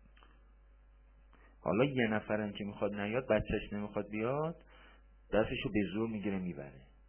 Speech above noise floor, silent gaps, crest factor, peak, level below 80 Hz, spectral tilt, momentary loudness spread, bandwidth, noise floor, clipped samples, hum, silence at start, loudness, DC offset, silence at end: 26 dB; none; 20 dB; -16 dBFS; -56 dBFS; -5.5 dB/octave; 9 LU; 3.3 kHz; -61 dBFS; under 0.1%; none; 1.45 s; -36 LUFS; under 0.1%; 0.25 s